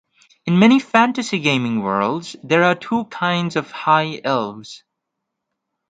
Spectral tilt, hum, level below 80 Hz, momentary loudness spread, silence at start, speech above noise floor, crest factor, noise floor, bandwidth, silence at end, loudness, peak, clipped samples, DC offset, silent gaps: -5.5 dB/octave; none; -64 dBFS; 12 LU; 0.45 s; 61 dB; 18 dB; -79 dBFS; 9.2 kHz; 1.15 s; -18 LUFS; 0 dBFS; under 0.1%; under 0.1%; none